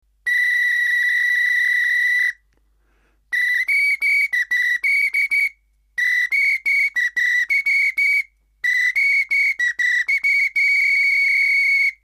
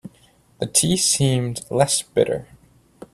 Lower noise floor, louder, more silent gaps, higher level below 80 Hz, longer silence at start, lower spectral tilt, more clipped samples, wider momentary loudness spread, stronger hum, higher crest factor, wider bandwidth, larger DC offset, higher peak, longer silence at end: first, -61 dBFS vs -55 dBFS; first, -16 LUFS vs -20 LUFS; neither; second, -64 dBFS vs -52 dBFS; first, 0.25 s vs 0.05 s; second, 3.5 dB/octave vs -4 dB/octave; neither; second, 5 LU vs 8 LU; neither; second, 8 dB vs 20 dB; about the same, 15.5 kHz vs 15.5 kHz; neither; second, -10 dBFS vs -2 dBFS; second, 0.1 s vs 0.7 s